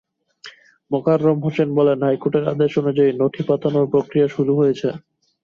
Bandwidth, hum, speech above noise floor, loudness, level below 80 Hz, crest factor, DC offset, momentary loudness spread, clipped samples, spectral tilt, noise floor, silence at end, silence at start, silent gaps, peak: 7 kHz; none; 26 dB; -19 LUFS; -62 dBFS; 14 dB; under 0.1%; 5 LU; under 0.1%; -9 dB/octave; -44 dBFS; 0.45 s; 0.45 s; none; -4 dBFS